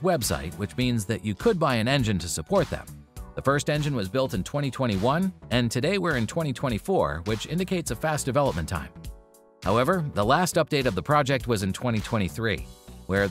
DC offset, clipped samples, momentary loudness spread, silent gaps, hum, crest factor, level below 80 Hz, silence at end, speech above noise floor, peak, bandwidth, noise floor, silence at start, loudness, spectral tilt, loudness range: under 0.1%; under 0.1%; 10 LU; none; none; 18 dB; -44 dBFS; 0 s; 26 dB; -8 dBFS; 16 kHz; -52 dBFS; 0 s; -26 LUFS; -5 dB/octave; 2 LU